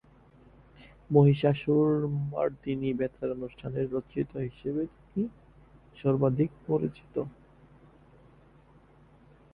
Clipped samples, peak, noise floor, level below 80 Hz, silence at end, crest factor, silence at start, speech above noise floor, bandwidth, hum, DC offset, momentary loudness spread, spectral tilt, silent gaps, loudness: under 0.1%; -8 dBFS; -58 dBFS; -58 dBFS; 2.25 s; 22 dB; 0.8 s; 30 dB; 4.2 kHz; none; under 0.1%; 13 LU; -11 dB/octave; none; -29 LUFS